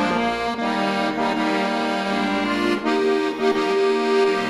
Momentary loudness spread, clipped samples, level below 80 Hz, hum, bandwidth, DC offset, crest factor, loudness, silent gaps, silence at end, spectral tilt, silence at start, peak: 3 LU; under 0.1%; -52 dBFS; none; 12.5 kHz; under 0.1%; 14 dB; -21 LUFS; none; 0 s; -5 dB/octave; 0 s; -8 dBFS